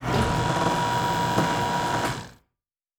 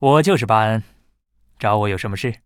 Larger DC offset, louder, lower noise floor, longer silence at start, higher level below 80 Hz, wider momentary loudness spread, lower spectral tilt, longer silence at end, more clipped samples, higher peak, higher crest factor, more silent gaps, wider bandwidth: neither; second, -24 LUFS vs -18 LUFS; first, -86 dBFS vs -60 dBFS; about the same, 0 s vs 0 s; first, -42 dBFS vs -50 dBFS; second, 4 LU vs 10 LU; second, -5 dB/octave vs -6.5 dB/octave; first, 0.65 s vs 0.1 s; neither; second, -10 dBFS vs -2 dBFS; about the same, 16 dB vs 18 dB; neither; first, over 20 kHz vs 16 kHz